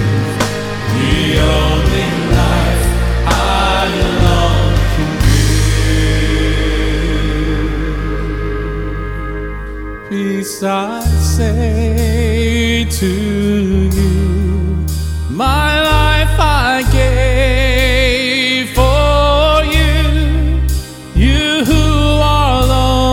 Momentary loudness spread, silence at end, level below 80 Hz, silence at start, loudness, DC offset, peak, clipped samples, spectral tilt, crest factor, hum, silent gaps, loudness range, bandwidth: 8 LU; 0 s; -16 dBFS; 0 s; -14 LUFS; under 0.1%; 0 dBFS; under 0.1%; -5.5 dB/octave; 12 dB; none; none; 6 LU; 17 kHz